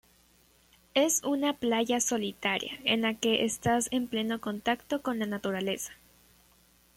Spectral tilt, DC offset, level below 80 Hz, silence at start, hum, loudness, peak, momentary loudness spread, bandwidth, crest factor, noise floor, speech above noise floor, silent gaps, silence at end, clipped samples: -3 dB/octave; under 0.1%; -64 dBFS; 0.95 s; none; -29 LUFS; -10 dBFS; 6 LU; 16.5 kHz; 20 dB; -63 dBFS; 34 dB; none; 1 s; under 0.1%